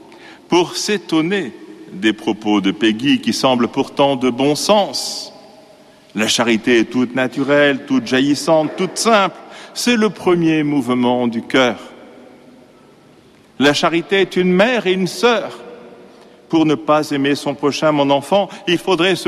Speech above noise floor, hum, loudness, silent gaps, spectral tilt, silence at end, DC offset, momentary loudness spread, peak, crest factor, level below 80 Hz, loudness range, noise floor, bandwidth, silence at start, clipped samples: 31 dB; none; -16 LUFS; none; -4.5 dB/octave; 0 s; under 0.1%; 7 LU; -2 dBFS; 16 dB; -58 dBFS; 3 LU; -47 dBFS; 14.5 kHz; 0.1 s; under 0.1%